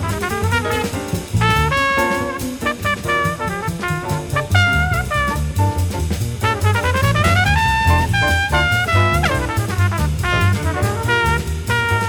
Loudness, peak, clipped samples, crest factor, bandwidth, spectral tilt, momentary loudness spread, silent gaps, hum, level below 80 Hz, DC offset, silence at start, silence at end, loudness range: -17 LUFS; 0 dBFS; under 0.1%; 18 dB; over 20 kHz; -5 dB/octave; 7 LU; none; none; -30 dBFS; under 0.1%; 0 s; 0 s; 3 LU